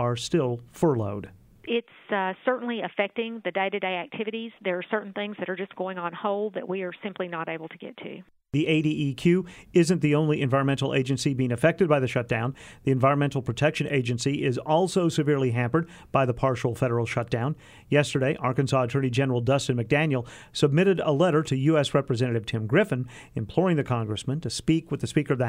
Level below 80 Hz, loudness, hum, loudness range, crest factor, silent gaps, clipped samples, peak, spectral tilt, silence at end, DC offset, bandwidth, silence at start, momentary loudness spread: -56 dBFS; -26 LUFS; none; 6 LU; 20 dB; none; under 0.1%; -6 dBFS; -6.5 dB/octave; 0 s; under 0.1%; 13 kHz; 0 s; 10 LU